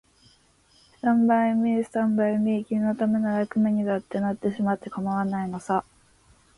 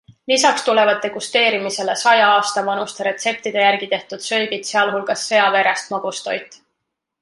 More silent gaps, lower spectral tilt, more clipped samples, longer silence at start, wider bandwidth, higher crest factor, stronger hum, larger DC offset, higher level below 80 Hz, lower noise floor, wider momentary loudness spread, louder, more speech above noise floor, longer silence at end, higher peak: neither; first, -8 dB/octave vs -1.5 dB/octave; neither; first, 1.05 s vs 0.3 s; about the same, 11 kHz vs 11.5 kHz; about the same, 14 dB vs 16 dB; neither; neither; first, -64 dBFS vs -70 dBFS; second, -60 dBFS vs -77 dBFS; about the same, 7 LU vs 9 LU; second, -25 LUFS vs -17 LUFS; second, 36 dB vs 60 dB; about the same, 0.75 s vs 0.65 s; second, -12 dBFS vs -2 dBFS